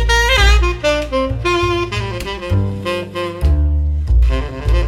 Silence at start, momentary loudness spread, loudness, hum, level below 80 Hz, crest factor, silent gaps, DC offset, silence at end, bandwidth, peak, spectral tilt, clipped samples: 0 s; 10 LU; -16 LUFS; none; -18 dBFS; 14 dB; none; under 0.1%; 0 s; 14.5 kHz; 0 dBFS; -5 dB/octave; under 0.1%